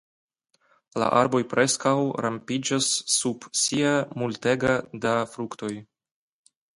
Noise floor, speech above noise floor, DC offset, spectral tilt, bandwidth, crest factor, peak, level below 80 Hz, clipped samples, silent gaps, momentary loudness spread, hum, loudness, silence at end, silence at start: -66 dBFS; 42 dB; under 0.1%; -3.5 dB/octave; 11.5 kHz; 22 dB; -4 dBFS; -62 dBFS; under 0.1%; none; 11 LU; none; -24 LUFS; 0.95 s; 0.95 s